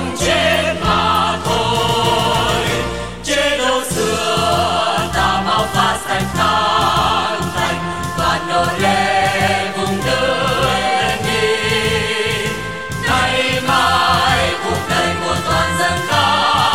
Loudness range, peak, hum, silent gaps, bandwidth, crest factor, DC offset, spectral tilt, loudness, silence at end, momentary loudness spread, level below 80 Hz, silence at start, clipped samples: 1 LU; 0 dBFS; none; none; 16.5 kHz; 14 dB; 1%; -3.5 dB/octave; -15 LUFS; 0 s; 5 LU; -34 dBFS; 0 s; under 0.1%